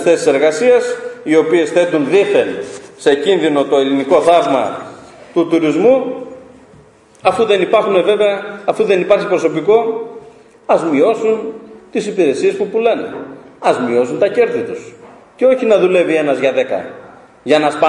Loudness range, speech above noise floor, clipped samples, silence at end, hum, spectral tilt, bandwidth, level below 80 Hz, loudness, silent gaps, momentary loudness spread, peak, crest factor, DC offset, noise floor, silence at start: 3 LU; 31 dB; under 0.1%; 0 s; none; -5 dB/octave; 11 kHz; -60 dBFS; -14 LUFS; none; 14 LU; 0 dBFS; 14 dB; under 0.1%; -44 dBFS; 0 s